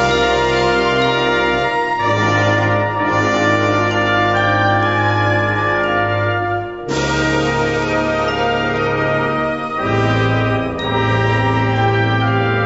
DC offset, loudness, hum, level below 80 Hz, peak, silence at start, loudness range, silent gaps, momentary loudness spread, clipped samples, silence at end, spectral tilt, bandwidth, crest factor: 0.3%; -16 LUFS; none; -38 dBFS; -2 dBFS; 0 s; 2 LU; none; 4 LU; under 0.1%; 0 s; -6 dB/octave; 8 kHz; 14 dB